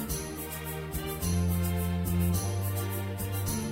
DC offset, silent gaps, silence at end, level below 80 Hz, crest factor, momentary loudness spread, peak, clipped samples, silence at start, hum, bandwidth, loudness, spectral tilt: under 0.1%; none; 0 s; -42 dBFS; 14 dB; 7 LU; -18 dBFS; under 0.1%; 0 s; none; 16.5 kHz; -31 LUFS; -5.5 dB/octave